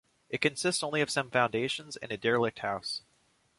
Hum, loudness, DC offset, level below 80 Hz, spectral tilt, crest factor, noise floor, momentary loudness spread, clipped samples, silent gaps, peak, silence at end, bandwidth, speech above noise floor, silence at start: none; -31 LUFS; under 0.1%; -68 dBFS; -3.5 dB/octave; 22 dB; -70 dBFS; 9 LU; under 0.1%; none; -10 dBFS; 0.6 s; 11.5 kHz; 39 dB; 0.3 s